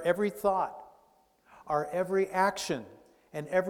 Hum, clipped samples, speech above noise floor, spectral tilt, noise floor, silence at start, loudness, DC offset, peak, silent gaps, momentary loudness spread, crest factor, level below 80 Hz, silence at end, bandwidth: none; under 0.1%; 36 dB; -5 dB/octave; -66 dBFS; 0 s; -31 LUFS; under 0.1%; -12 dBFS; none; 14 LU; 20 dB; -66 dBFS; 0 s; 18 kHz